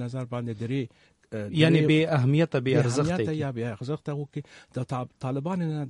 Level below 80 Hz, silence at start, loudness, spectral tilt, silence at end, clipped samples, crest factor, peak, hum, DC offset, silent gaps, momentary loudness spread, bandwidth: -60 dBFS; 0 s; -26 LUFS; -7 dB/octave; 0 s; under 0.1%; 20 dB; -6 dBFS; none; under 0.1%; none; 15 LU; 11 kHz